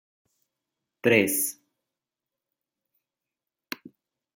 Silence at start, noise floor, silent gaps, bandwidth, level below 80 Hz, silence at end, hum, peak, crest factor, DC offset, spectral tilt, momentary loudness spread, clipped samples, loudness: 1.05 s; -89 dBFS; none; 16.5 kHz; -76 dBFS; 2.85 s; none; -8 dBFS; 24 dB; under 0.1%; -3.5 dB/octave; 19 LU; under 0.1%; -23 LUFS